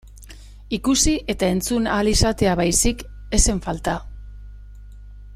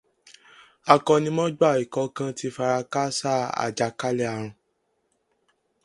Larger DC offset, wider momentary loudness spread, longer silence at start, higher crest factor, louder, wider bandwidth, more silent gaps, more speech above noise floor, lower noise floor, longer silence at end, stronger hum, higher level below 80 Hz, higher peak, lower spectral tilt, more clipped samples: neither; about the same, 12 LU vs 10 LU; second, 0.05 s vs 0.85 s; second, 20 dB vs 26 dB; first, -20 LUFS vs -24 LUFS; first, 16 kHz vs 11.5 kHz; neither; second, 21 dB vs 49 dB; second, -41 dBFS vs -73 dBFS; second, 0 s vs 1.3 s; first, 50 Hz at -35 dBFS vs none; first, -30 dBFS vs -68 dBFS; about the same, -2 dBFS vs 0 dBFS; second, -3.5 dB/octave vs -5 dB/octave; neither